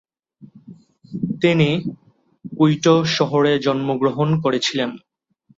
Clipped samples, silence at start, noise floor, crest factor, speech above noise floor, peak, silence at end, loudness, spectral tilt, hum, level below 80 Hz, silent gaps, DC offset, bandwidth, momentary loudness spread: under 0.1%; 0.4 s; -59 dBFS; 16 dB; 42 dB; -4 dBFS; 0.6 s; -18 LUFS; -6 dB/octave; none; -58 dBFS; none; under 0.1%; 7.8 kHz; 11 LU